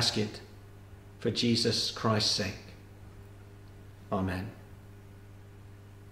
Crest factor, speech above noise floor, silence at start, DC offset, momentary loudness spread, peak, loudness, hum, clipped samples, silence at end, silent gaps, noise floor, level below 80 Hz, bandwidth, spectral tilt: 22 dB; 20 dB; 0 s; under 0.1%; 25 LU; -12 dBFS; -30 LUFS; 50 Hz at -50 dBFS; under 0.1%; 0 s; none; -50 dBFS; -56 dBFS; 16 kHz; -4 dB/octave